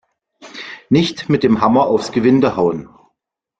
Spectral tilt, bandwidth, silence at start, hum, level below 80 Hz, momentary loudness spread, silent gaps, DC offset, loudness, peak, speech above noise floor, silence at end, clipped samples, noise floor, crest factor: -6.5 dB/octave; 9 kHz; 0.4 s; none; -50 dBFS; 18 LU; none; under 0.1%; -15 LUFS; -2 dBFS; 61 dB; 0.75 s; under 0.1%; -75 dBFS; 14 dB